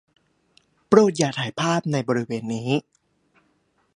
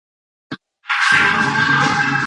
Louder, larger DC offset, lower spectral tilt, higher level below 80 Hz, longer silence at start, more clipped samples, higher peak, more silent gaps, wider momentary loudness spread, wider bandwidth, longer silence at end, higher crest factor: second, -22 LUFS vs -14 LUFS; neither; first, -5.5 dB/octave vs -3.5 dB/octave; second, -64 dBFS vs -52 dBFS; first, 0.9 s vs 0.5 s; neither; about the same, -2 dBFS vs 0 dBFS; neither; second, 9 LU vs 22 LU; about the same, 11 kHz vs 11 kHz; first, 1.15 s vs 0 s; first, 22 dB vs 16 dB